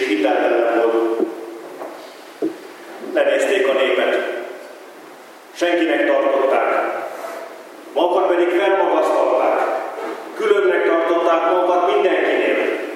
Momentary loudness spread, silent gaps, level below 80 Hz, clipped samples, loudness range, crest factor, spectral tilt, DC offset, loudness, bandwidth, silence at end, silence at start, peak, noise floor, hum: 17 LU; none; -88 dBFS; under 0.1%; 3 LU; 16 dB; -3 dB/octave; under 0.1%; -18 LUFS; 16 kHz; 0 s; 0 s; -2 dBFS; -40 dBFS; none